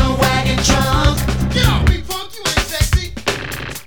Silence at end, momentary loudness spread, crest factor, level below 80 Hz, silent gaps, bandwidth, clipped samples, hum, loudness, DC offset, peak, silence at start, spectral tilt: 0.05 s; 7 LU; 16 dB; -22 dBFS; none; over 20 kHz; under 0.1%; none; -16 LUFS; under 0.1%; 0 dBFS; 0 s; -4 dB/octave